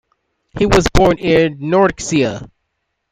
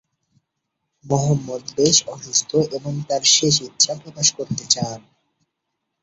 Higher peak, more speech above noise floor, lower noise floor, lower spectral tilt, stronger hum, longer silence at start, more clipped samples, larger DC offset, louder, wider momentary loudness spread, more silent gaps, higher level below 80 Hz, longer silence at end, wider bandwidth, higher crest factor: about the same, 0 dBFS vs -2 dBFS; about the same, 58 dB vs 58 dB; second, -72 dBFS vs -78 dBFS; first, -5.5 dB/octave vs -3 dB/octave; neither; second, 0.55 s vs 1.05 s; neither; neither; first, -14 LUFS vs -18 LUFS; second, 8 LU vs 12 LU; neither; first, -28 dBFS vs -58 dBFS; second, 0.65 s vs 1.05 s; first, 15.5 kHz vs 8.4 kHz; about the same, 16 dB vs 20 dB